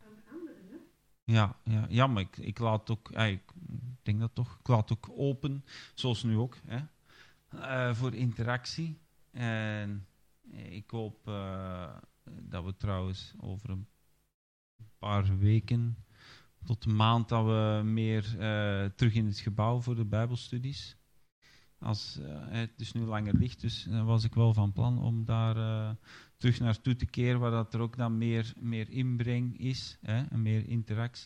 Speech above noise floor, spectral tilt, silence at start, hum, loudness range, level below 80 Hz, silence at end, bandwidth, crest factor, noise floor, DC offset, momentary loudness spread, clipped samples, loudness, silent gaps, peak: 29 dB; -7.5 dB/octave; 0.05 s; none; 9 LU; -56 dBFS; 0 s; 8.6 kHz; 22 dB; -60 dBFS; under 0.1%; 15 LU; under 0.1%; -32 LUFS; 1.23-1.27 s, 14.34-14.79 s, 21.32-21.42 s; -12 dBFS